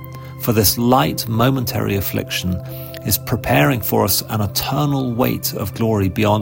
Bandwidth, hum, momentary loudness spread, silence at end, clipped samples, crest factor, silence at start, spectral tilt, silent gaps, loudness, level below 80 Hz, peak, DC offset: 16.5 kHz; none; 7 LU; 0 s; under 0.1%; 18 dB; 0 s; -5 dB/octave; none; -18 LUFS; -40 dBFS; 0 dBFS; under 0.1%